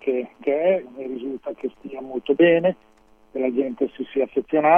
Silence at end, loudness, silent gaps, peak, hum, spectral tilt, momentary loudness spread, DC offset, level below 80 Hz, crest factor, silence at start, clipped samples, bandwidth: 0 s; -23 LUFS; none; -4 dBFS; none; -8.5 dB/octave; 15 LU; under 0.1%; -64 dBFS; 18 dB; 0.05 s; under 0.1%; 3.6 kHz